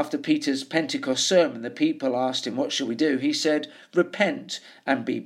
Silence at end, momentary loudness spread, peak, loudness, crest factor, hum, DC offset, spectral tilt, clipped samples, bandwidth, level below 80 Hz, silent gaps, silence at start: 0.05 s; 6 LU; -6 dBFS; -25 LUFS; 20 dB; none; under 0.1%; -3.5 dB/octave; under 0.1%; 14 kHz; -80 dBFS; none; 0 s